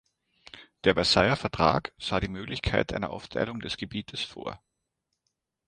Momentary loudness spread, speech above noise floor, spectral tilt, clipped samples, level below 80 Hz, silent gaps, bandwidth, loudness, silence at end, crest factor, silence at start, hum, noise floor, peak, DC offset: 13 LU; 54 dB; -5 dB/octave; under 0.1%; -48 dBFS; none; 11.5 kHz; -28 LUFS; 1.1 s; 24 dB; 0.55 s; none; -82 dBFS; -6 dBFS; under 0.1%